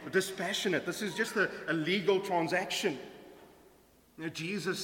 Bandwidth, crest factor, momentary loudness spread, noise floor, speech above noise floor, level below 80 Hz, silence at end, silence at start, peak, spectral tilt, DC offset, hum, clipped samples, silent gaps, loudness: 17 kHz; 20 dB; 12 LU; -63 dBFS; 30 dB; -72 dBFS; 0 s; 0 s; -14 dBFS; -4 dB/octave; under 0.1%; none; under 0.1%; none; -32 LUFS